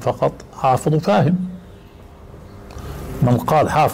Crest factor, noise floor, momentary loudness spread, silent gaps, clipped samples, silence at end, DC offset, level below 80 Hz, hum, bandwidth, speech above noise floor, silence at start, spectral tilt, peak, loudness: 12 dB; -41 dBFS; 22 LU; none; under 0.1%; 0 s; under 0.1%; -40 dBFS; none; 16 kHz; 24 dB; 0 s; -7 dB/octave; -8 dBFS; -18 LUFS